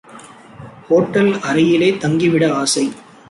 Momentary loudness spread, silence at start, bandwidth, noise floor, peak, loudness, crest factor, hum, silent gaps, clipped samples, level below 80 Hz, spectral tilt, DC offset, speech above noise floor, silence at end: 4 LU; 0.15 s; 11.5 kHz; -39 dBFS; -2 dBFS; -15 LUFS; 14 dB; none; none; under 0.1%; -56 dBFS; -5 dB/octave; under 0.1%; 25 dB; 0.3 s